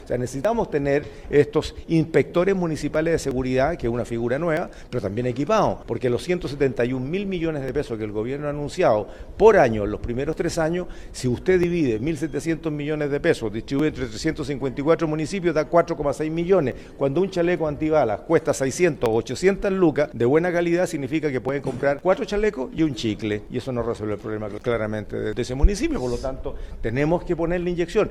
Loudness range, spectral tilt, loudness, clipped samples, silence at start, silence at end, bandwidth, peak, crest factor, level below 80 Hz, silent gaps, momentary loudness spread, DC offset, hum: 4 LU; -6.5 dB/octave; -23 LUFS; under 0.1%; 0 s; 0 s; 14 kHz; -2 dBFS; 20 dB; -36 dBFS; none; 7 LU; under 0.1%; none